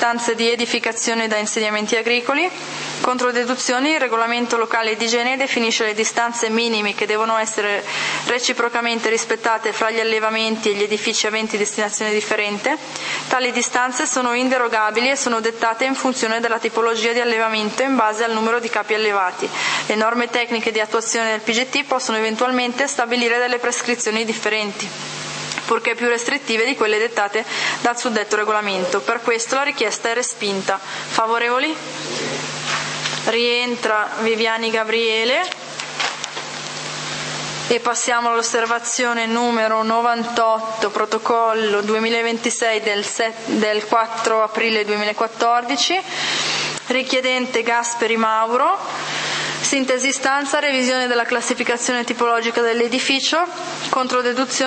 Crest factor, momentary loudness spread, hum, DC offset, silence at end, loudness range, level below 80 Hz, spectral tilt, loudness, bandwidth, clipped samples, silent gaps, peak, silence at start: 20 dB; 5 LU; none; under 0.1%; 0 s; 2 LU; -72 dBFS; -2 dB/octave; -19 LUFS; 8.8 kHz; under 0.1%; none; 0 dBFS; 0 s